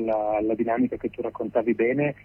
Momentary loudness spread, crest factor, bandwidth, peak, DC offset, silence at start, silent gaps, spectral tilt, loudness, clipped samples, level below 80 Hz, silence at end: 7 LU; 14 dB; 3.3 kHz; -10 dBFS; under 0.1%; 0 s; none; -10 dB/octave; -25 LUFS; under 0.1%; -56 dBFS; 0.1 s